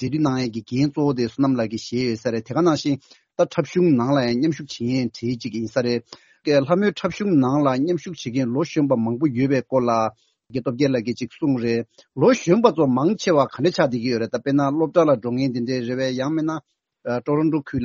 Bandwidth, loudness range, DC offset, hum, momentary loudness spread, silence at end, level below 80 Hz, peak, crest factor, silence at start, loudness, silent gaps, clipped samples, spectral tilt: 7.4 kHz; 3 LU; under 0.1%; none; 9 LU; 0 s; -58 dBFS; 0 dBFS; 20 dB; 0 s; -21 LUFS; none; under 0.1%; -6 dB/octave